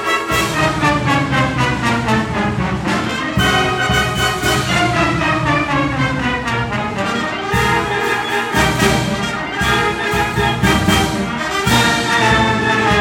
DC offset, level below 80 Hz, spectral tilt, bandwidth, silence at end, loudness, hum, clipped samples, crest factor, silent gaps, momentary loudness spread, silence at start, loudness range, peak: under 0.1%; -32 dBFS; -4.5 dB/octave; 17.5 kHz; 0 s; -15 LUFS; none; under 0.1%; 16 dB; none; 5 LU; 0 s; 2 LU; 0 dBFS